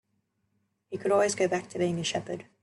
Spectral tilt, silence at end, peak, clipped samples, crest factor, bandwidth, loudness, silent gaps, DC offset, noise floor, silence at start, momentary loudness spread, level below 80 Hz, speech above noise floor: -4 dB/octave; 0.2 s; -12 dBFS; under 0.1%; 18 dB; 12 kHz; -28 LUFS; none; under 0.1%; -76 dBFS; 0.9 s; 11 LU; -70 dBFS; 48 dB